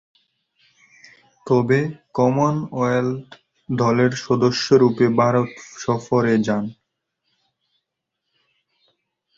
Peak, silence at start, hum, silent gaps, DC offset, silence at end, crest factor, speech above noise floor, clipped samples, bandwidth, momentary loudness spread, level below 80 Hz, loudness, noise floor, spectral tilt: -2 dBFS; 1.45 s; none; none; under 0.1%; 2.65 s; 18 dB; 61 dB; under 0.1%; 7.8 kHz; 10 LU; -58 dBFS; -19 LUFS; -79 dBFS; -6.5 dB/octave